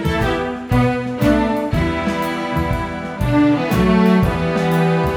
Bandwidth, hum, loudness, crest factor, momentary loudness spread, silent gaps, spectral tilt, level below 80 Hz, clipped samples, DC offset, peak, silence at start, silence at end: over 20 kHz; none; -17 LUFS; 14 dB; 7 LU; none; -7 dB/octave; -30 dBFS; under 0.1%; under 0.1%; -2 dBFS; 0 s; 0 s